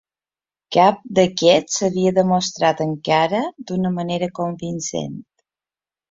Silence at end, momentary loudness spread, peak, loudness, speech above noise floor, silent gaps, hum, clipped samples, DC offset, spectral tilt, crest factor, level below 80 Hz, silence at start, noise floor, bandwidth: 0.9 s; 10 LU; -2 dBFS; -19 LUFS; over 71 dB; none; none; under 0.1%; under 0.1%; -4.5 dB/octave; 18 dB; -58 dBFS; 0.7 s; under -90 dBFS; 7.8 kHz